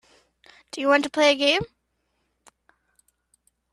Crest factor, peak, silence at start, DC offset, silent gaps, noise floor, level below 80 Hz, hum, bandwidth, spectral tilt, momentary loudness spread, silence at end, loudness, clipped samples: 20 dB; -6 dBFS; 0.75 s; under 0.1%; none; -74 dBFS; -60 dBFS; none; 12 kHz; -3 dB/octave; 18 LU; 2.05 s; -21 LUFS; under 0.1%